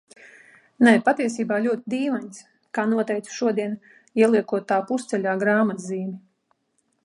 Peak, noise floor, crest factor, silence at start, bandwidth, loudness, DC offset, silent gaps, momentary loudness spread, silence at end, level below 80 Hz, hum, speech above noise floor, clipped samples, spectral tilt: -4 dBFS; -71 dBFS; 20 dB; 0.25 s; 11 kHz; -23 LUFS; under 0.1%; none; 12 LU; 0.85 s; -76 dBFS; none; 49 dB; under 0.1%; -5.5 dB/octave